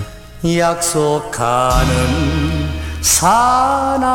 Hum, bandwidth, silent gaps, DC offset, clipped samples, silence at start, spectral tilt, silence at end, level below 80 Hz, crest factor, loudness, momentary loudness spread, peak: none; 17.5 kHz; none; under 0.1%; under 0.1%; 0 s; -4 dB/octave; 0 s; -26 dBFS; 14 dB; -15 LUFS; 8 LU; 0 dBFS